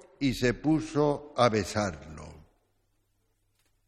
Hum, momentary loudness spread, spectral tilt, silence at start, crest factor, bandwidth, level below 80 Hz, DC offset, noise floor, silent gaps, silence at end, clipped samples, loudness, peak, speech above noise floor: none; 17 LU; -5.5 dB/octave; 0.2 s; 22 dB; 14 kHz; -52 dBFS; under 0.1%; -73 dBFS; none; 1.5 s; under 0.1%; -28 LUFS; -8 dBFS; 46 dB